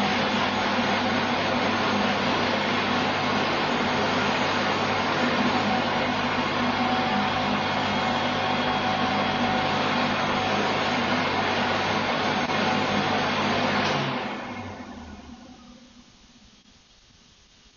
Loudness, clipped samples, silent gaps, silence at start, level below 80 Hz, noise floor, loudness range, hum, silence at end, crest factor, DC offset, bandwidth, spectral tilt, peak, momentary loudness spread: -24 LUFS; under 0.1%; none; 0 s; -52 dBFS; -55 dBFS; 5 LU; none; 1.9 s; 16 dB; under 0.1%; 7.2 kHz; -4.5 dB/octave; -10 dBFS; 1 LU